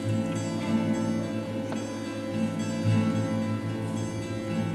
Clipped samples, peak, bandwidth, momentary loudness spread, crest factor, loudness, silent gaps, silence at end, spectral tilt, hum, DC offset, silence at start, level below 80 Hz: under 0.1%; -14 dBFS; 13 kHz; 7 LU; 14 dB; -29 LUFS; none; 0 s; -6.5 dB/octave; none; under 0.1%; 0 s; -60 dBFS